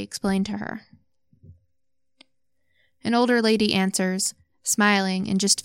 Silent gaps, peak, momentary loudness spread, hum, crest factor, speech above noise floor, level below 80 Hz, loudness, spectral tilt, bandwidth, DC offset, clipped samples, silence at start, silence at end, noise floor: none; -6 dBFS; 13 LU; none; 20 dB; 59 dB; -60 dBFS; -22 LUFS; -3.5 dB/octave; 16.5 kHz; under 0.1%; under 0.1%; 0 s; 0.05 s; -82 dBFS